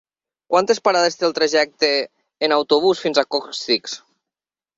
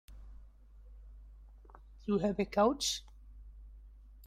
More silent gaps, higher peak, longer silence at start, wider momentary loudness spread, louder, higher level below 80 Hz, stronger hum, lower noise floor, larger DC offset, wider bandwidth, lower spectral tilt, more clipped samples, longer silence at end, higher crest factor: neither; first, -2 dBFS vs -16 dBFS; first, 0.5 s vs 0.1 s; second, 7 LU vs 27 LU; first, -18 LUFS vs -33 LUFS; second, -66 dBFS vs -54 dBFS; neither; first, -89 dBFS vs -56 dBFS; neither; second, 7.8 kHz vs 16 kHz; second, -2.5 dB/octave vs -4 dB/octave; neither; first, 0.8 s vs 0 s; about the same, 18 dB vs 22 dB